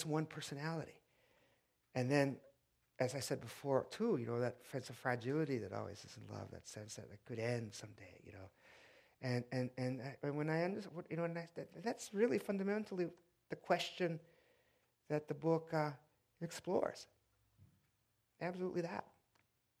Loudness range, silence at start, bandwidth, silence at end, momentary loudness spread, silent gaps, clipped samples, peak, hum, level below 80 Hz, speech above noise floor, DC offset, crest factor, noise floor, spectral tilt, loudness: 5 LU; 0 s; 16 kHz; 0.75 s; 15 LU; none; under 0.1%; -20 dBFS; none; -82 dBFS; 40 dB; under 0.1%; 24 dB; -82 dBFS; -6 dB/octave; -42 LUFS